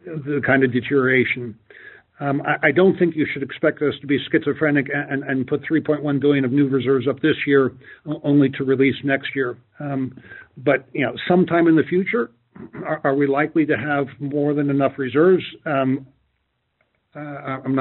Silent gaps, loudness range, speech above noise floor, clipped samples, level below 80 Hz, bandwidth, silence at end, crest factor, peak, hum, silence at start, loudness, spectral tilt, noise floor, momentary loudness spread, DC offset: none; 2 LU; 51 dB; under 0.1%; -62 dBFS; 4.2 kHz; 0 s; 18 dB; -2 dBFS; none; 0.05 s; -20 LUFS; -5.5 dB/octave; -71 dBFS; 11 LU; under 0.1%